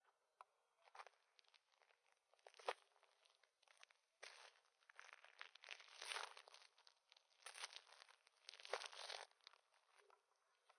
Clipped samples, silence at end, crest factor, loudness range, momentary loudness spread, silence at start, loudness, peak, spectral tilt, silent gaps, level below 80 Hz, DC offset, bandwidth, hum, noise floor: under 0.1%; 0.05 s; 32 dB; 4 LU; 16 LU; 0.05 s; -56 LUFS; -28 dBFS; 3 dB/octave; none; under -90 dBFS; under 0.1%; 12 kHz; none; -85 dBFS